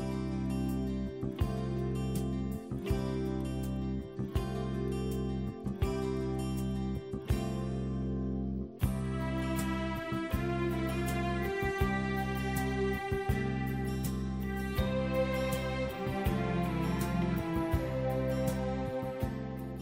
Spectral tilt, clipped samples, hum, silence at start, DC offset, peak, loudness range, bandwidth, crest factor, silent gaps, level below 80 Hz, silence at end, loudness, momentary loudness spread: -7 dB/octave; under 0.1%; none; 0 s; under 0.1%; -16 dBFS; 3 LU; 16 kHz; 16 dB; none; -42 dBFS; 0 s; -34 LUFS; 4 LU